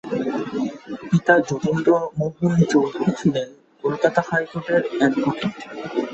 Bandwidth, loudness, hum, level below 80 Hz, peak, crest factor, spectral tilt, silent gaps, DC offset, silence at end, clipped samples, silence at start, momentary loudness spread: 8.2 kHz; -21 LUFS; none; -58 dBFS; -2 dBFS; 20 dB; -7 dB/octave; none; under 0.1%; 0 s; under 0.1%; 0.05 s; 10 LU